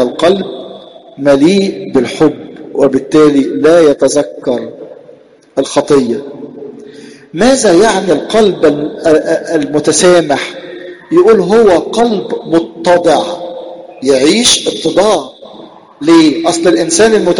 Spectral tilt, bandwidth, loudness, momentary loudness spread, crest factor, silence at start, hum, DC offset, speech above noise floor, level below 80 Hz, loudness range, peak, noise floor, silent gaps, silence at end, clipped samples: -4 dB/octave; 12 kHz; -10 LUFS; 19 LU; 10 dB; 0 s; none; under 0.1%; 31 dB; -44 dBFS; 3 LU; 0 dBFS; -39 dBFS; none; 0 s; under 0.1%